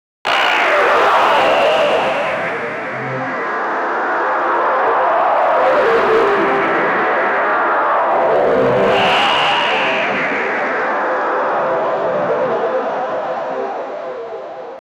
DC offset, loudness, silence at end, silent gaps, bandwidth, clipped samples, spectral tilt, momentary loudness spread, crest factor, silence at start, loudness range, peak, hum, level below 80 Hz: under 0.1%; -15 LUFS; 0.2 s; none; 15 kHz; under 0.1%; -4 dB/octave; 9 LU; 12 dB; 0.25 s; 4 LU; -4 dBFS; none; -56 dBFS